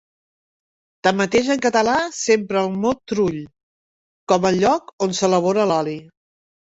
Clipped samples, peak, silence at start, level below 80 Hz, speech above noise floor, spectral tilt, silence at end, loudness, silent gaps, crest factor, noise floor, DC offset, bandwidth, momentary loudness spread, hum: under 0.1%; -2 dBFS; 1.05 s; -56 dBFS; over 71 dB; -4.5 dB/octave; 0.65 s; -19 LUFS; 3.63-4.27 s, 4.93-4.98 s; 18 dB; under -90 dBFS; under 0.1%; 8.2 kHz; 6 LU; none